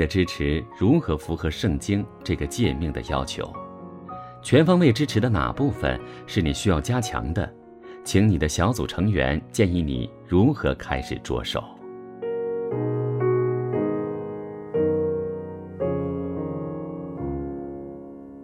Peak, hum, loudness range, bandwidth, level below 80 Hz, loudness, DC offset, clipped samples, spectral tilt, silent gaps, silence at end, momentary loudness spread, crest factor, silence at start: -4 dBFS; none; 5 LU; 15.5 kHz; -38 dBFS; -25 LUFS; under 0.1%; under 0.1%; -6.5 dB/octave; none; 0 s; 14 LU; 20 dB; 0 s